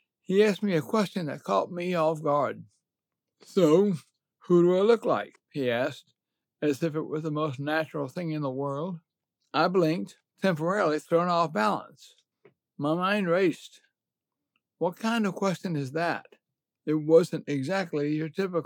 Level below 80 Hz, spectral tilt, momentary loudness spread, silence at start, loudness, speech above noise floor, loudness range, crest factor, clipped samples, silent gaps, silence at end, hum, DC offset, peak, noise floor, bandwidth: under -90 dBFS; -6.5 dB/octave; 11 LU; 0.3 s; -27 LUFS; 62 dB; 5 LU; 20 dB; under 0.1%; none; 0 s; none; under 0.1%; -8 dBFS; -89 dBFS; 17.5 kHz